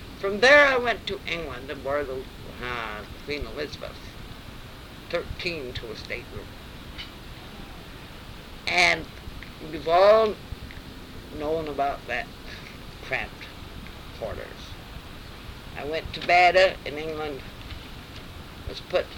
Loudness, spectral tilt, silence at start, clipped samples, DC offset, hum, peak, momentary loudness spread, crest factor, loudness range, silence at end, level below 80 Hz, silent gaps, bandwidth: -24 LUFS; -4 dB/octave; 0 s; under 0.1%; under 0.1%; none; -6 dBFS; 23 LU; 22 dB; 12 LU; 0 s; -44 dBFS; none; 18.5 kHz